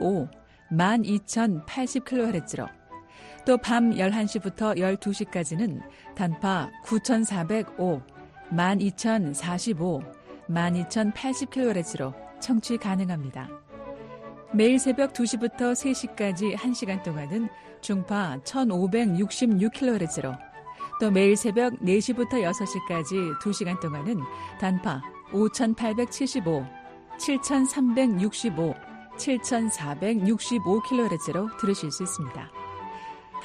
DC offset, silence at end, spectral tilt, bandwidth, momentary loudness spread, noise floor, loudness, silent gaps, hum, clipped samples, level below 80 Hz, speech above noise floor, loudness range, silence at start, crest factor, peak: under 0.1%; 0 s; -5.5 dB/octave; 11.5 kHz; 15 LU; -47 dBFS; -26 LUFS; none; none; under 0.1%; -60 dBFS; 21 dB; 3 LU; 0 s; 18 dB; -8 dBFS